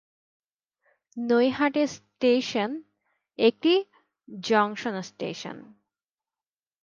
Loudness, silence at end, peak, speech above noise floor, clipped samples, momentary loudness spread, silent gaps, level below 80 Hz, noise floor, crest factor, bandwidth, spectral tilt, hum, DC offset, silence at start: -25 LUFS; 1.2 s; -8 dBFS; over 65 dB; under 0.1%; 19 LU; none; -74 dBFS; under -90 dBFS; 20 dB; 7.4 kHz; -4.5 dB/octave; none; under 0.1%; 1.15 s